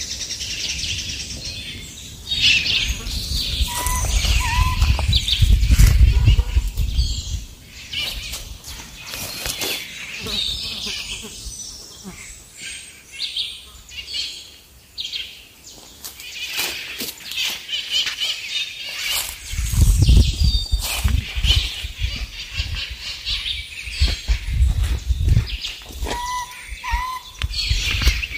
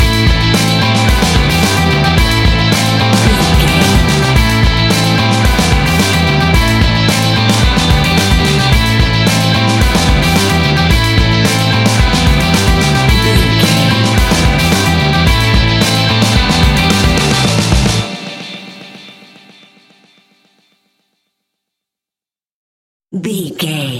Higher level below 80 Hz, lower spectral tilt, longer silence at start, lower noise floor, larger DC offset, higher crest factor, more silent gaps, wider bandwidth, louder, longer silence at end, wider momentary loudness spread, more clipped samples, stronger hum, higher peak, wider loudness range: second, -24 dBFS vs -18 dBFS; second, -3 dB/octave vs -4.5 dB/octave; about the same, 0 s vs 0 s; second, -46 dBFS vs under -90 dBFS; neither; first, 20 dB vs 10 dB; second, none vs 22.51-23.00 s; about the same, 16 kHz vs 17 kHz; second, -22 LUFS vs -10 LUFS; about the same, 0 s vs 0 s; first, 17 LU vs 1 LU; neither; neither; about the same, -2 dBFS vs 0 dBFS; first, 10 LU vs 5 LU